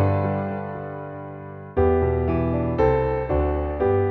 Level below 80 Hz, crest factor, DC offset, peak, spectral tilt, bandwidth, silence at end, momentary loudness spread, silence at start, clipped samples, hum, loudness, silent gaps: -32 dBFS; 14 dB; under 0.1%; -8 dBFS; -11 dB/octave; 4.8 kHz; 0 s; 14 LU; 0 s; under 0.1%; none; -23 LUFS; none